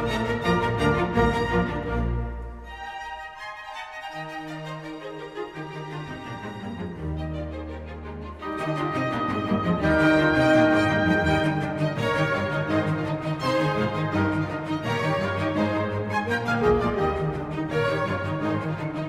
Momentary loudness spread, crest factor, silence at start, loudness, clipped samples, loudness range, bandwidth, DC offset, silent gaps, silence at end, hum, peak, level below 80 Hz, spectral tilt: 15 LU; 18 dB; 0 s; -25 LUFS; under 0.1%; 13 LU; 14 kHz; under 0.1%; none; 0 s; none; -8 dBFS; -40 dBFS; -7 dB/octave